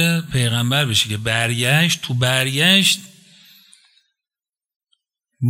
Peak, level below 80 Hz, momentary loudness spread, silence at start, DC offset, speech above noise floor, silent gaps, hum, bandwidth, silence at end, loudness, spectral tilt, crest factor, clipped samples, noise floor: -2 dBFS; -52 dBFS; 6 LU; 0 s; under 0.1%; over 72 dB; 4.76-4.80 s; none; 16 kHz; 0 s; -16 LUFS; -3.5 dB/octave; 18 dB; under 0.1%; under -90 dBFS